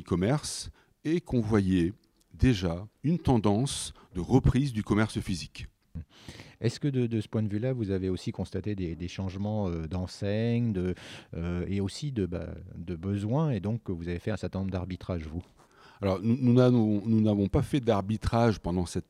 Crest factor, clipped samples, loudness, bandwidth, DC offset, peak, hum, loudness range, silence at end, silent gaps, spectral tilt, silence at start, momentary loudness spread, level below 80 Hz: 18 dB; under 0.1%; -29 LUFS; 13 kHz; under 0.1%; -10 dBFS; none; 6 LU; 0.05 s; none; -7 dB/octave; 0 s; 13 LU; -46 dBFS